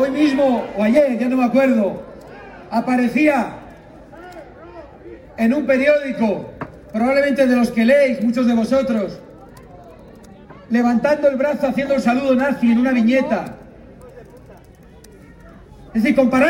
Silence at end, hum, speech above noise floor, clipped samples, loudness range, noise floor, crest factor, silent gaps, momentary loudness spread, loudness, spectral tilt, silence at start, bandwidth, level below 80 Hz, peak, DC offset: 0 s; none; 28 dB; under 0.1%; 5 LU; -44 dBFS; 14 dB; none; 22 LU; -17 LUFS; -6.5 dB/octave; 0 s; 16 kHz; -50 dBFS; -4 dBFS; under 0.1%